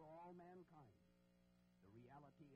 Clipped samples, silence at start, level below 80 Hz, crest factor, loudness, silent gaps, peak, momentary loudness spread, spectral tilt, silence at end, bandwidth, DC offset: under 0.1%; 0 s; -88 dBFS; 14 dB; -64 LUFS; none; -52 dBFS; 7 LU; -7 dB/octave; 0 s; 5.2 kHz; under 0.1%